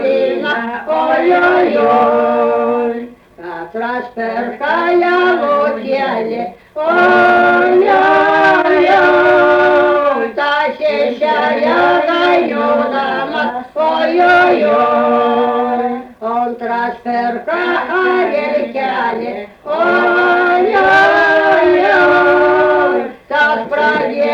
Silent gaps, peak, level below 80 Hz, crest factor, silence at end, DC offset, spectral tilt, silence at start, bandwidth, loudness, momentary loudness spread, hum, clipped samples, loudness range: none; -2 dBFS; -52 dBFS; 10 dB; 0 s; under 0.1%; -5.5 dB/octave; 0 s; 7.2 kHz; -12 LUFS; 10 LU; none; under 0.1%; 6 LU